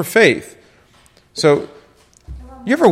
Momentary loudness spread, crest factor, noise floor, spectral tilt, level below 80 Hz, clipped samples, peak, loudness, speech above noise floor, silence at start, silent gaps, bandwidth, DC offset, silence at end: 25 LU; 18 dB; -51 dBFS; -4.5 dB/octave; -44 dBFS; under 0.1%; 0 dBFS; -15 LUFS; 38 dB; 0 s; none; 16 kHz; under 0.1%; 0 s